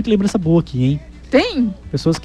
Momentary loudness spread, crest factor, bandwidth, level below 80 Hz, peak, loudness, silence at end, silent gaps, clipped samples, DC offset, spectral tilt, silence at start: 5 LU; 14 dB; 11.5 kHz; -38 dBFS; -2 dBFS; -18 LUFS; 0 s; none; under 0.1%; under 0.1%; -7 dB/octave; 0 s